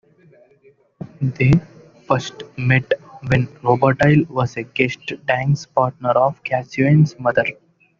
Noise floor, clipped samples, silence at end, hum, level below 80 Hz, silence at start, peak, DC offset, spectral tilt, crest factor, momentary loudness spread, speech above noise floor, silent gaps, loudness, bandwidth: -51 dBFS; under 0.1%; 0.45 s; none; -48 dBFS; 1.2 s; -2 dBFS; under 0.1%; -6.5 dB/octave; 18 dB; 10 LU; 33 dB; none; -18 LUFS; 7.4 kHz